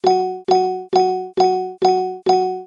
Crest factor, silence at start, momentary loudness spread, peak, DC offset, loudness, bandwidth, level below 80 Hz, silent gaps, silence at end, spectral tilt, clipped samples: 14 dB; 0.05 s; 2 LU; -2 dBFS; under 0.1%; -18 LUFS; 7.4 kHz; -64 dBFS; none; 0 s; -5.5 dB/octave; under 0.1%